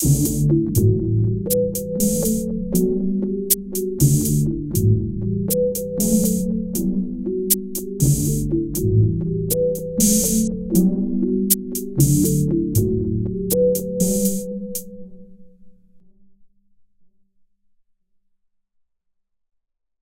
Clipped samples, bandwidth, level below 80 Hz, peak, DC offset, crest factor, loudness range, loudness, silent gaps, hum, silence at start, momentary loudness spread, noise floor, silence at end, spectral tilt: under 0.1%; 17 kHz; -36 dBFS; 0 dBFS; under 0.1%; 20 dB; 5 LU; -20 LUFS; none; none; 0 s; 6 LU; -71 dBFS; 3.55 s; -6.5 dB/octave